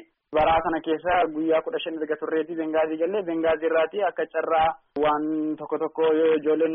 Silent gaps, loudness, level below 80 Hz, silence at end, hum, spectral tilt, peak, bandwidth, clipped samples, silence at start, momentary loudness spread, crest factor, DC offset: none; -24 LUFS; -52 dBFS; 0 s; none; -3 dB/octave; -10 dBFS; 3.8 kHz; under 0.1%; 0.3 s; 7 LU; 14 dB; under 0.1%